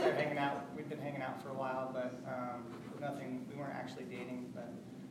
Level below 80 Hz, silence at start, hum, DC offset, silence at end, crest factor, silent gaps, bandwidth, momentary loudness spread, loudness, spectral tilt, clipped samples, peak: -78 dBFS; 0 s; none; under 0.1%; 0 s; 20 dB; none; 16 kHz; 10 LU; -42 LUFS; -6.5 dB/octave; under 0.1%; -20 dBFS